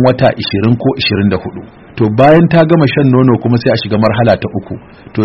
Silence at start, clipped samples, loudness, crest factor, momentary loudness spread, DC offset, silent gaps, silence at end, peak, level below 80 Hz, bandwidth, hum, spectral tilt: 0 s; 0.3%; -10 LUFS; 10 dB; 16 LU; under 0.1%; none; 0 s; 0 dBFS; -40 dBFS; 5.8 kHz; none; -9.5 dB/octave